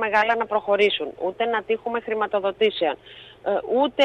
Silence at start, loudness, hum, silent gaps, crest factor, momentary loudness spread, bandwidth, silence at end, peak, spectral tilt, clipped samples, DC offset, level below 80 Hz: 0 s; -23 LUFS; none; none; 16 dB; 8 LU; 8.4 kHz; 0 s; -6 dBFS; -4.5 dB/octave; under 0.1%; under 0.1%; -62 dBFS